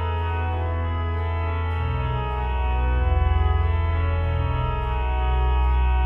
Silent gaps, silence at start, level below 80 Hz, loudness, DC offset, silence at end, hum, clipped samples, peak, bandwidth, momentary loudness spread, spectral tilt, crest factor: none; 0 s; -24 dBFS; -24 LUFS; under 0.1%; 0 s; none; under 0.1%; -10 dBFS; 4 kHz; 4 LU; -9 dB/octave; 12 dB